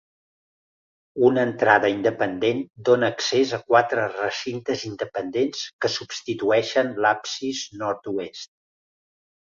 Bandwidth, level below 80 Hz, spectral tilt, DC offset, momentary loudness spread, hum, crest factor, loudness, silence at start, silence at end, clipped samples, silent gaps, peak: 7.6 kHz; -66 dBFS; -4 dB/octave; under 0.1%; 11 LU; none; 22 dB; -23 LUFS; 1.15 s; 1.1 s; under 0.1%; 5.73-5.79 s; -2 dBFS